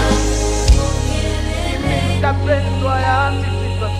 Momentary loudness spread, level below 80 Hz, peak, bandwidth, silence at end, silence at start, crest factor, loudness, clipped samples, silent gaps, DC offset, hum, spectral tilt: 5 LU; -20 dBFS; 0 dBFS; 14 kHz; 0 s; 0 s; 14 dB; -17 LUFS; under 0.1%; none; under 0.1%; none; -5 dB/octave